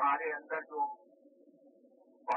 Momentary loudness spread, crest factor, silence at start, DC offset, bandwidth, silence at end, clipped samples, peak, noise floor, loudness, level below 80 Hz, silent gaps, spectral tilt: 14 LU; 18 dB; 0 s; under 0.1%; 3.2 kHz; 0 s; under 0.1%; -20 dBFS; -64 dBFS; -37 LUFS; under -90 dBFS; none; 5.5 dB/octave